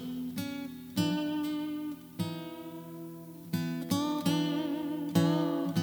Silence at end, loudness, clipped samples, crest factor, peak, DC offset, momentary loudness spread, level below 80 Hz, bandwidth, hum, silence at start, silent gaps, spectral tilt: 0 s; -33 LUFS; under 0.1%; 20 dB; -14 dBFS; under 0.1%; 15 LU; -72 dBFS; over 20 kHz; none; 0 s; none; -6 dB/octave